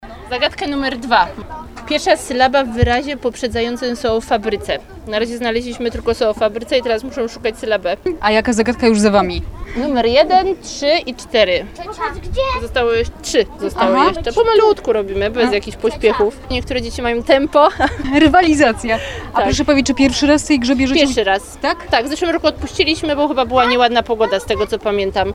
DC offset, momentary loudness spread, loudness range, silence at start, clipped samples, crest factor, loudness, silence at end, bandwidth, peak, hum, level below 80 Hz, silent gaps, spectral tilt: under 0.1%; 9 LU; 5 LU; 0 s; under 0.1%; 16 dB; -16 LUFS; 0 s; 15 kHz; 0 dBFS; none; -34 dBFS; none; -4.5 dB/octave